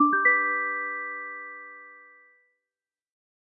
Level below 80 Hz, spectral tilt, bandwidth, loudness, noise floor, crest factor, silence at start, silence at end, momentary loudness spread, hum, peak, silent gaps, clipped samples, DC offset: under -90 dBFS; -4 dB/octave; 2.6 kHz; -25 LUFS; under -90 dBFS; 20 dB; 0 s; 1.45 s; 22 LU; none; -10 dBFS; none; under 0.1%; under 0.1%